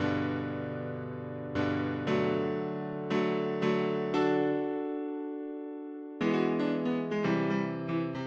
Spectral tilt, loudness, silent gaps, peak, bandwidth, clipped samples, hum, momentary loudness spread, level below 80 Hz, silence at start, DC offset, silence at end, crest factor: -7.5 dB/octave; -32 LUFS; none; -16 dBFS; 7.6 kHz; under 0.1%; none; 10 LU; -68 dBFS; 0 s; under 0.1%; 0 s; 16 dB